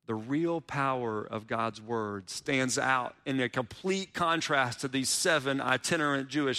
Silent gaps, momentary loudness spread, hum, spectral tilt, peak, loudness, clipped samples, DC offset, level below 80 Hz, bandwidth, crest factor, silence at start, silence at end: none; 7 LU; none; -3.5 dB/octave; -12 dBFS; -30 LUFS; under 0.1%; under 0.1%; -68 dBFS; 15.5 kHz; 18 dB; 0.1 s; 0 s